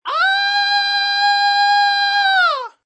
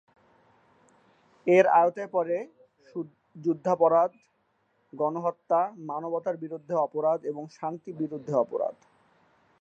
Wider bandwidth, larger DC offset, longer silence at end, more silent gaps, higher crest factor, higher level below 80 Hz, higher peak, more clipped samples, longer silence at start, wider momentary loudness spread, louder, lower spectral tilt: about the same, 8.6 kHz vs 8 kHz; neither; second, 0.15 s vs 0.9 s; neither; second, 10 dB vs 22 dB; second, under -90 dBFS vs -82 dBFS; about the same, -6 dBFS vs -6 dBFS; neither; second, 0.05 s vs 1.45 s; second, 2 LU vs 15 LU; first, -14 LUFS vs -27 LUFS; second, 6.5 dB/octave vs -7.5 dB/octave